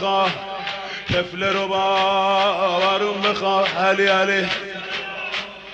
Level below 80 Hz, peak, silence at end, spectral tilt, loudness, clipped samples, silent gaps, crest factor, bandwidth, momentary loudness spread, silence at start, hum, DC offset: -52 dBFS; -6 dBFS; 0 s; -4 dB/octave; -20 LUFS; under 0.1%; none; 14 dB; 8.4 kHz; 10 LU; 0 s; none; under 0.1%